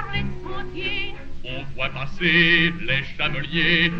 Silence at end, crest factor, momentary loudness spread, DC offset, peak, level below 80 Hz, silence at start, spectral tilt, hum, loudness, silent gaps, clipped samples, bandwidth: 0 s; 18 dB; 17 LU; under 0.1%; -4 dBFS; -36 dBFS; 0 s; -6 dB/octave; none; -21 LUFS; none; under 0.1%; 6.4 kHz